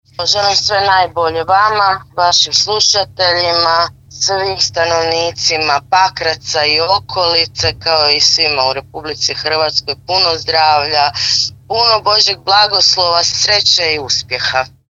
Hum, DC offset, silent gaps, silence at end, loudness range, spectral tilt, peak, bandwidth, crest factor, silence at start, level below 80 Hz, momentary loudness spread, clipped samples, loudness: none; under 0.1%; none; 0.2 s; 3 LU; -1 dB/octave; 0 dBFS; 9.8 kHz; 14 dB; 0.2 s; -46 dBFS; 6 LU; under 0.1%; -12 LUFS